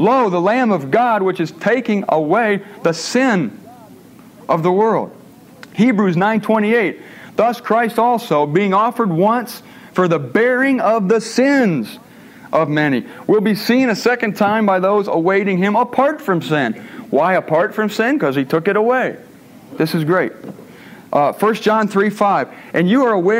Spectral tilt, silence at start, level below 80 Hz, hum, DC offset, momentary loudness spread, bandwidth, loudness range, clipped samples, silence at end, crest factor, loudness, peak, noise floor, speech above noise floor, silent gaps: -6 dB/octave; 0 s; -66 dBFS; none; under 0.1%; 7 LU; 16 kHz; 3 LU; under 0.1%; 0 s; 14 dB; -16 LUFS; -2 dBFS; -41 dBFS; 26 dB; none